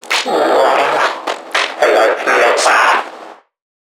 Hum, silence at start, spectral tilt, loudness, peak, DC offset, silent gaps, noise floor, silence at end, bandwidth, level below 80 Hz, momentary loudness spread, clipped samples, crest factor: none; 0.05 s; -0.5 dB/octave; -12 LUFS; 0 dBFS; under 0.1%; none; -35 dBFS; 0.45 s; 18.5 kHz; -68 dBFS; 7 LU; under 0.1%; 14 dB